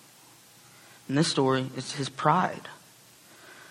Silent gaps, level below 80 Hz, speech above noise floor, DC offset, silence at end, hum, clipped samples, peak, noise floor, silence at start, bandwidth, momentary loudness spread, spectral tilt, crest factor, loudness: none; -70 dBFS; 28 dB; under 0.1%; 0.05 s; none; under 0.1%; -8 dBFS; -55 dBFS; 1.1 s; 16 kHz; 24 LU; -5 dB/octave; 22 dB; -27 LUFS